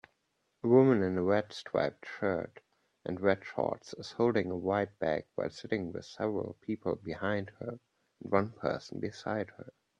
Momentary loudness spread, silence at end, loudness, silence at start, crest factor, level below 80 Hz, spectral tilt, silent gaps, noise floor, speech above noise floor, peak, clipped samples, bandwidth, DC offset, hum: 14 LU; 0.3 s; -33 LUFS; 0.65 s; 22 dB; -70 dBFS; -7 dB/octave; none; -79 dBFS; 47 dB; -12 dBFS; under 0.1%; 8.8 kHz; under 0.1%; none